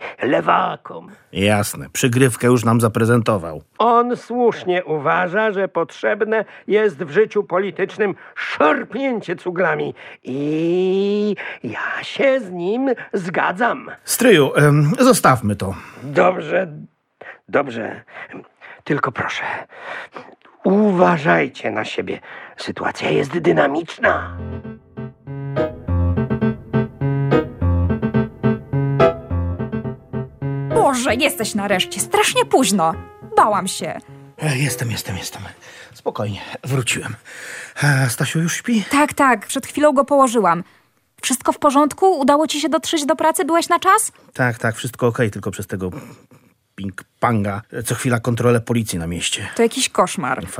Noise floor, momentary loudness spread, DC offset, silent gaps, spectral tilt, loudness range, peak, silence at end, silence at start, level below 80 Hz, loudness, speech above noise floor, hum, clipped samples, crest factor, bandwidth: -41 dBFS; 15 LU; under 0.1%; none; -5 dB/octave; 7 LU; -2 dBFS; 0 s; 0 s; -44 dBFS; -18 LUFS; 23 dB; none; under 0.1%; 18 dB; 16 kHz